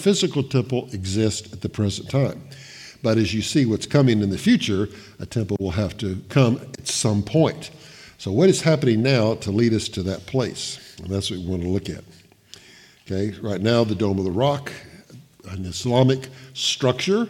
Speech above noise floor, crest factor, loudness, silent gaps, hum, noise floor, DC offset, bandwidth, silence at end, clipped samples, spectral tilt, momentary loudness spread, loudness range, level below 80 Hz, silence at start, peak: 28 dB; 18 dB; -22 LUFS; none; none; -49 dBFS; under 0.1%; 15.5 kHz; 0 s; under 0.1%; -5.5 dB/octave; 15 LU; 5 LU; -54 dBFS; 0 s; -4 dBFS